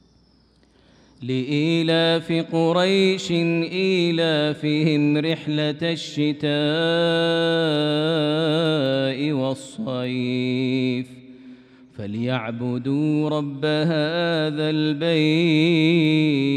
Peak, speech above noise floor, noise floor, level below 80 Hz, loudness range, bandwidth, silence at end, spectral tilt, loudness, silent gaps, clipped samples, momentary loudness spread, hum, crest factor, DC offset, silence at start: -8 dBFS; 37 dB; -57 dBFS; -66 dBFS; 5 LU; 10 kHz; 0 s; -6.5 dB/octave; -21 LUFS; none; under 0.1%; 8 LU; none; 14 dB; under 0.1%; 1.2 s